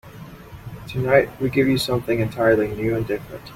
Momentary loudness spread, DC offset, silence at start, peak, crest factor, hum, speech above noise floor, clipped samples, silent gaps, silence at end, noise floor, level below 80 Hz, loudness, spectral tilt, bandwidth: 21 LU; under 0.1%; 0.05 s; -2 dBFS; 18 dB; none; 20 dB; under 0.1%; none; 0 s; -40 dBFS; -46 dBFS; -21 LUFS; -6.5 dB/octave; 16.5 kHz